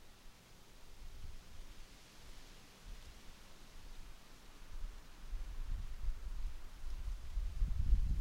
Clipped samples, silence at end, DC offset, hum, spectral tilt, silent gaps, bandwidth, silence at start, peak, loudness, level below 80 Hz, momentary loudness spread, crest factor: under 0.1%; 0 s; under 0.1%; none; -5 dB/octave; none; 15 kHz; 0 s; -20 dBFS; -48 LUFS; -42 dBFS; 17 LU; 22 dB